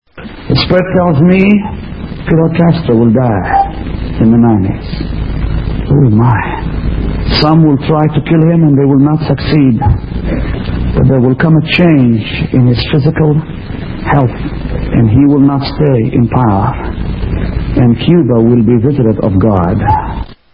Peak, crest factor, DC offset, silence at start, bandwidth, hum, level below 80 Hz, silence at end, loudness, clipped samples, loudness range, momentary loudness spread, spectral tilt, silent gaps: 0 dBFS; 10 dB; 0.3%; 0.15 s; 5.4 kHz; none; -22 dBFS; 0.2 s; -10 LUFS; 0.1%; 2 LU; 11 LU; -10.5 dB/octave; none